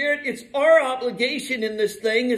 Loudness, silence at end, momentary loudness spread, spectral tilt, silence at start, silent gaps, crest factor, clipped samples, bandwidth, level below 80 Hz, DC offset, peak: -21 LUFS; 0 s; 9 LU; -3 dB/octave; 0 s; none; 16 dB; under 0.1%; 13.5 kHz; -66 dBFS; under 0.1%; -6 dBFS